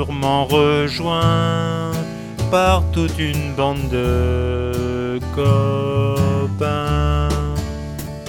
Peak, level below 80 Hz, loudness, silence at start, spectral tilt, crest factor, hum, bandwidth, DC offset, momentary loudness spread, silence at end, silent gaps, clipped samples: -2 dBFS; -28 dBFS; -19 LUFS; 0 s; -6.5 dB/octave; 16 dB; none; 18.5 kHz; under 0.1%; 8 LU; 0 s; none; under 0.1%